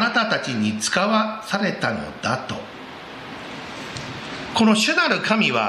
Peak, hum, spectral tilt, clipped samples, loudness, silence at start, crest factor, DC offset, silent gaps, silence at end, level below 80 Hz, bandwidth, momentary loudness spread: -2 dBFS; none; -3.5 dB/octave; under 0.1%; -21 LUFS; 0 s; 20 dB; under 0.1%; none; 0 s; -56 dBFS; 13.5 kHz; 17 LU